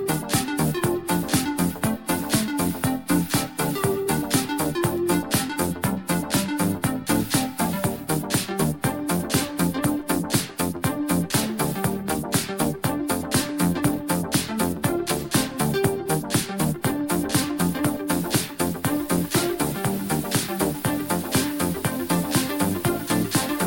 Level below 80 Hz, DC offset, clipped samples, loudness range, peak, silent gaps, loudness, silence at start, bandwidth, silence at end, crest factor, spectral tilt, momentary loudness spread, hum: -48 dBFS; under 0.1%; under 0.1%; 1 LU; -6 dBFS; none; -24 LUFS; 0 s; 17 kHz; 0 s; 18 dB; -4.5 dB/octave; 3 LU; none